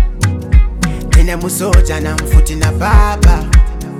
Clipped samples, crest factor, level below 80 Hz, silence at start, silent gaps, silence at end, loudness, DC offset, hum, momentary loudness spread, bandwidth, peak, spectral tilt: 0.4%; 10 dB; -12 dBFS; 0 s; none; 0 s; -13 LUFS; under 0.1%; none; 6 LU; 15 kHz; 0 dBFS; -5.5 dB/octave